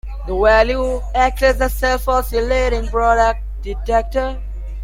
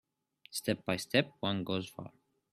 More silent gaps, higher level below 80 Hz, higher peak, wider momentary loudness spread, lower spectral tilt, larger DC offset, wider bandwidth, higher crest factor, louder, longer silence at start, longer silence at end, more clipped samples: neither; first, -24 dBFS vs -72 dBFS; first, -2 dBFS vs -12 dBFS; second, 12 LU vs 16 LU; about the same, -5 dB/octave vs -4.5 dB/octave; neither; about the same, 16.5 kHz vs 15.5 kHz; second, 16 dB vs 24 dB; first, -17 LUFS vs -34 LUFS; second, 0.05 s vs 0.5 s; second, 0 s vs 0.45 s; neither